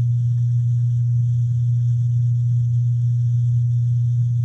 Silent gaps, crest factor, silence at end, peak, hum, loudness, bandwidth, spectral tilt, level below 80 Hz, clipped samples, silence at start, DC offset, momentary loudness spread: none; 6 dB; 0 s; -12 dBFS; 60 Hz at -20 dBFS; -19 LUFS; 0.5 kHz; -10 dB/octave; -52 dBFS; under 0.1%; 0 s; under 0.1%; 1 LU